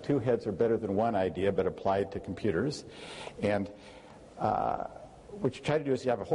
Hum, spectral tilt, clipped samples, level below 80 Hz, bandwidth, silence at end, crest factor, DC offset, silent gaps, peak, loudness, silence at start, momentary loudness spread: none; -7 dB/octave; under 0.1%; -58 dBFS; 11 kHz; 0 s; 14 dB; under 0.1%; none; -16 dBFS; -31 LUFS; 0 s; 16 LU